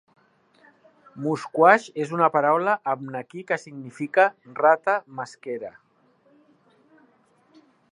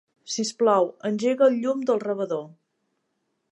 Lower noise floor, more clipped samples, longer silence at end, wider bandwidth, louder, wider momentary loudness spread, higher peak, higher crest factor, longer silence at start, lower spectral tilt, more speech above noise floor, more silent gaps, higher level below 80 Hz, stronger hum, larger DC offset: second, -62 dBFS vs -75 dBFS; neither; first, 2.2 s vs 1.05 s; about the same, 11 kHz vs 11 kHz; about the same, -23 LUFS vs -24 LUFS; first, 17 LU vs 9 LU; first, -2 dBFS vs -6 dBFS; first, 24 dB vs 18 dB; first, 1.15 s vs 0.25 s; first, -6 dB/octave vs -4.5 dB/octave; second, 39 dB vs 52 dB; neither; about the same, -80 dBFS vs -82 dBFS; neither; neither